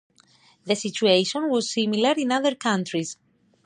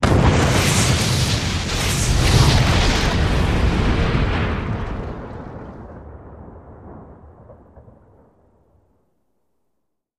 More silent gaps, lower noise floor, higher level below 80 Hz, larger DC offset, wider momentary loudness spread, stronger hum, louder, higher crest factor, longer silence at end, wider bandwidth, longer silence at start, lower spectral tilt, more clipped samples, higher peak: neither; second, -58 dBFS vs -74 dBFS; second, -76 dBFS vs -26 dBFS; neither; second, 11 LU vs 24 LU; neither; second, -23 LUFS vs -18 LUFS; about the same, 18 dB vs 16 dB; second, 0.55 s vs 2.65 s; second, 10.5 kHz vs 15.5 kHz; first, 0.65 s vs 0 s; about the same, -4 dB/octave vs -4.5 dB/octave; neither; about the same, -6 dBFS vs -4 dBFS